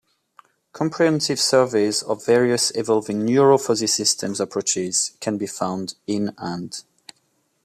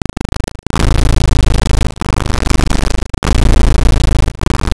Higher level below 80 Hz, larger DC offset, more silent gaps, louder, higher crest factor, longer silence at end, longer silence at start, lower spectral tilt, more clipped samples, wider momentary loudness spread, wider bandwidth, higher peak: second, -66 dBFS vs -12 dBFS; neither; second, none vs 3.18-3.22 s; second, -20 LUFS vs -15 LUFS; first, 18 dB vs 10 dB; first, 0.85 s vs 0 s; about the same, 0.75 s vs 0.75 s; second, -3.5 dB/octave vs -5.5 dB/octave; neither; first, 10 LU vs 7 LU; first, 15 kHz vs 11 kHz; about the same, -4 dBFS vs -2 dBFS